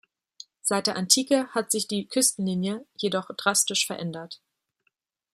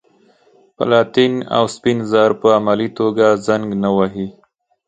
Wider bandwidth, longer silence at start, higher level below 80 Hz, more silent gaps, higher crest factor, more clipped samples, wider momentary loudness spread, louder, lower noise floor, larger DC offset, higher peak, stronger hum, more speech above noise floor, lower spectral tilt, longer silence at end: first, 15.5 kHz vs 9.2 kHz; second, 0.65 s vs 0.8 s; second, -74 dBFS vs -56 dBFS; neither; first, 24 dB vs 16 dB; neither; first, 13 LU vs 6 LU; second, -25 LUFS vs -16 LUFS; first, -75 dBFS vs -53 dBFS; neither; second, -4 dBFS vs 0 dBFS; neither; first, 49 dB vs 38 dB; second, -2.5 dB/octave vs -6 dB/octave; first, 1 s vs 0.55 s